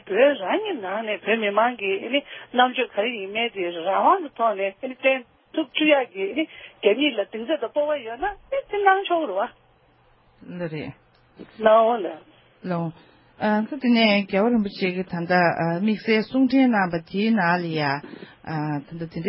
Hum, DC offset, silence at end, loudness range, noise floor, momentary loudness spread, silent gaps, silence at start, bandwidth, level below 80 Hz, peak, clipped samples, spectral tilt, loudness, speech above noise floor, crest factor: none; under 0.1%; 0 s; 4 LU; -58 dBFS; 12 LU; none; 0.05 s; 5.8 kHz; -62 dBFS; -2 dBFS; under 0.1%; -10 dB/octave; -23 LUFS; 36 dB; 20 dB